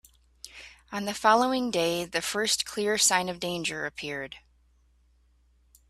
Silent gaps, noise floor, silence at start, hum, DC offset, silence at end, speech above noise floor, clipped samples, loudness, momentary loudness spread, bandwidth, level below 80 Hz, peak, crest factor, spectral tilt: none; -64 dBFS; 0.45 s; none; under 0.1%; 1.5 s; 37 dB; under 0.1%; -26 LUFS; 22 LU; 15.5 kHz; -62 dBFS; -8 dBFS; 22 dB; -2 dB/octave